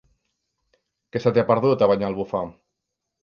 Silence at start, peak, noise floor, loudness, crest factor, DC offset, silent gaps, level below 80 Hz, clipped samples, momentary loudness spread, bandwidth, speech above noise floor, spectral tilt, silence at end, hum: 1.15 s; -4 dBFS; -81 dBFS; -21 LUFS; 20 dB; under 0.1%; none; -58 dBFS; under 0.1%; 12 LU; 6.8 kHz; 61 dB; -8.5 dB/octave; 0.7 s; none